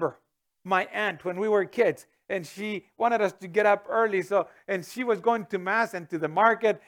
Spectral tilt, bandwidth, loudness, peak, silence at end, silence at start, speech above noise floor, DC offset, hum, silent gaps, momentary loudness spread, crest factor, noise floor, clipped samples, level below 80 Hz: -5.5 dB/octave; 18 kHz; -26 LUFS; -6 dBFS; 0.1 s; 0 s; 42 dB; under 0.1%; none; none; 11 LU; 20 dB; -68 dBFS; under 0.1%; -78 dBFS